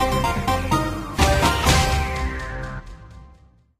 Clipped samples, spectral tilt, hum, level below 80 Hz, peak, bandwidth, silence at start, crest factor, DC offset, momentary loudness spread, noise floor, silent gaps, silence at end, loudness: under 0.1%; -4.5 dB/octave; none; -28 dBFS; -2 dBFS; 15.5 kHz; 0 s; 20 dB; under 0.1%; 14 LU; -52 dBFS; none; 0.5 s; -21 LUFS